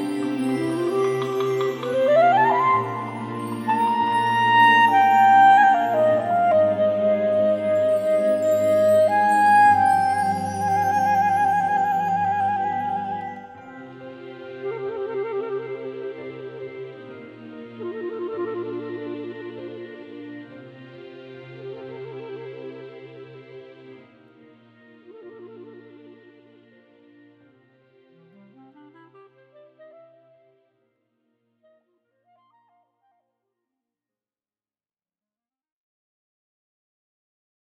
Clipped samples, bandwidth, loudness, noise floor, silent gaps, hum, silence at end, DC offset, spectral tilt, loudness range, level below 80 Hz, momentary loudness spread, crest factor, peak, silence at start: under 0.1%; 15 kHz; -20 LUFS; under -90 dBFS; none; none; 12 s; under 0.1%; -5.5 dB/octave; 22 LU; -74 dBFS; 25 LU; 18 dB; -6 dBFS; 0 s